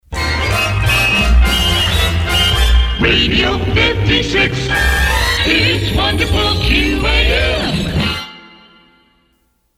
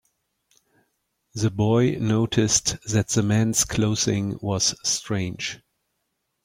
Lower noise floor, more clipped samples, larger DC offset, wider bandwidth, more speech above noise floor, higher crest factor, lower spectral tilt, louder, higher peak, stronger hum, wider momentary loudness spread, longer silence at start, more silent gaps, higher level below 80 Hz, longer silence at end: second, -60 dBFS vs -76 dBFS; neither; neither; about the same, 16 kHz vs 16.5 kHz; second, 47 dB vs 54 dB; about the same, 14 dB vs 18 dB; about the same, -4 dB/octave vs -4 dB/octave; first, -13 LUFS vs -22 LUFS; first, 0 dBFS vs -6 dBFS; neither; second, 5 LU vs 8 LU; second, 0.1 s vs 1.35 s; neither; first, -18 dBFS vs -50 dBFS; first, 1.3 s vs 0.9 s